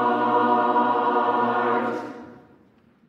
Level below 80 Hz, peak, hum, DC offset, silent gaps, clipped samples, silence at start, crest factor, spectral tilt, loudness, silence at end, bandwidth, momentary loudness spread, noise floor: -74 dBFS; -8 dBFS; none; under 0.1%; none; under 0.1%; 0 s; 14 dB; -6.5 dB/octave; -22 LUFS; 0.75 s; 7 kHz; 13 LU; -57 dBFS